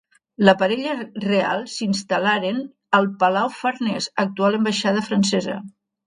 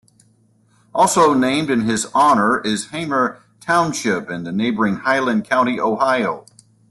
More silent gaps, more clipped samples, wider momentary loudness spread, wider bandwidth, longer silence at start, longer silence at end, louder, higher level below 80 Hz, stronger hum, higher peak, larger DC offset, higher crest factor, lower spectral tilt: neither; neither; about the same, 8 LU vs 9 LU; second, 10.5 kHz vs 12.5 kHz; second, 0.4 s vs 0.95 s; about the same, 0.4 s vs 0.5 s; second, -21 LUFS vs -18 LUFS; second, -64 dBFS vs -58 dBFS; neither; about the same, 0 dBFS vs -2 dBFS; neither; about the same, 20 dB vs 16 dB; about the same, -5 dB/octave vs -4 dB/octave